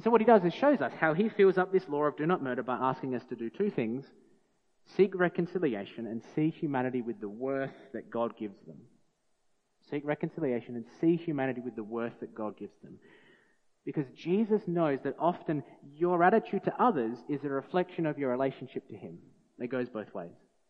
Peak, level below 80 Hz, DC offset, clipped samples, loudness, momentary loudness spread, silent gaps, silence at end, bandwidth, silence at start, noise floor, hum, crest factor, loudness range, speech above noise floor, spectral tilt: -8 dBFS; -80 dBFS; under 0.1%; under 0.1%; -31 LUFS; 15 LU; none; 0.4 s; 6.4 kHz; 0 s; -73 dBFS; none; 22 dB; 8 LU; 42 dB; -9 dB/octave